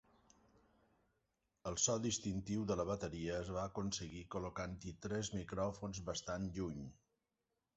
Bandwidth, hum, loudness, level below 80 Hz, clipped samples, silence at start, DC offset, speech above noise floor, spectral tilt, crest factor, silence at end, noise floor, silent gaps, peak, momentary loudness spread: 8 kHz; none; -42 LUFS; -60 dBFS; under 0.1%; 1.65 s; under 0.1%; 47 dB; -5.5 dB/octave; 22 dB; 0.85 s; -89 dBFS; none; -20 dBFS; 10 LU